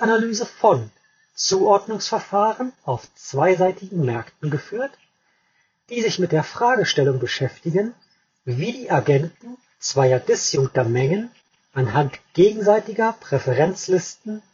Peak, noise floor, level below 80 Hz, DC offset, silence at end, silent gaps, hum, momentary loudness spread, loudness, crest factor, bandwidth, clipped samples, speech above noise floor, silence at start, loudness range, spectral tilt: -2 dBFS; -66 dBFS; -62 dBFS; under 0.1%; 0.15 s; none; none; 11 LU; -21 LUFS; 18 dB; 7.4 kHz; under 0.1%; 45 dB; 0 s; 3 LU; -5 dB/octave